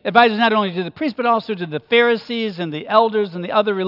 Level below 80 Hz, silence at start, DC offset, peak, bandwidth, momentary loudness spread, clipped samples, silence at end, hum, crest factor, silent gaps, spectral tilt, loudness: -68 dBFS; 0.05 s; under 0.1%; 0 dBFS; 5.8 kHz; 10 LU; under 0.1%; 0 s; none; 18 dB; none; -7 dB/octave; -18 LUFS